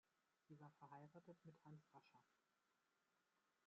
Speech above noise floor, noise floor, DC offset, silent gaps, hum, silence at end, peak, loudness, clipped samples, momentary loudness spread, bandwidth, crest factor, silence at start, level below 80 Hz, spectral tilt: 21 dB; -88 dBFS; under 0.1%; none; none; 0 s; -50 dBFS; -66 LUFS; under 0.1%; 3 LU; 7.2 kHz; 18 dB; 0.05 s; under -90 dBFS; -7 dB/octave